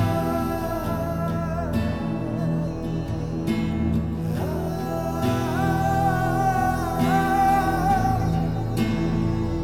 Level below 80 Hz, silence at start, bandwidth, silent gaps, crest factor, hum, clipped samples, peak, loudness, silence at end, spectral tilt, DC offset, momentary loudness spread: -36 dBFS; 0 s; 17.5 kHz; none; 14 dB; none; under 0.1%; -10 dBFS; -24 LUFS; 0 s; -7 dB/octave; 0.3%; 6 LU